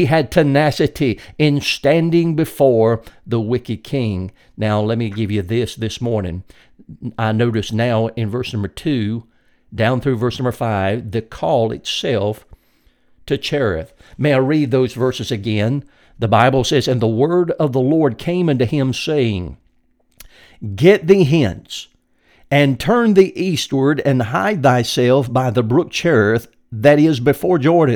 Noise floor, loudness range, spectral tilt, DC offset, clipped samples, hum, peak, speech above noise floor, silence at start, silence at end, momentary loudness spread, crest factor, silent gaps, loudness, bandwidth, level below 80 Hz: -59 dBFS; 6 LU; -6.5 dB/octave; under 0.1%; under 0.1%; none; 0 dBFS; 43 dB; 0 s; 0 s; 11 LU; 16 dB; none; -17 LUFS; 18.5 kHz; -44 dBFS